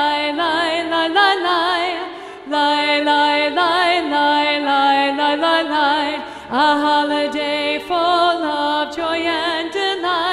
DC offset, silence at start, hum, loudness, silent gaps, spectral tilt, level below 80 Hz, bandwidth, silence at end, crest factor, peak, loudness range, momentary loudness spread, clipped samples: under 0.1%; 0 s; none; -17 LUFS; none; -2.5 dB/octave; -56 dBFS; 12.5 kHz; 0 s; 14 dB; -2 dBFS; 2 LU; 6 LU; under 0.1%